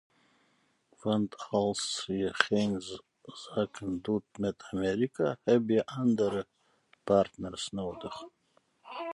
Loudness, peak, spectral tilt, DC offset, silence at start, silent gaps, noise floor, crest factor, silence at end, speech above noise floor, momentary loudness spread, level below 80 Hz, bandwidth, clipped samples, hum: -31 LUFS; -4 dBFS; -5 dB/octave; under 0.1%; 1.05 s; none; -71 dBFS; 28 dB; 0 s; 41 dB; 17 LU; -62 dBFS; 11.5 kHz; under 0.1%; none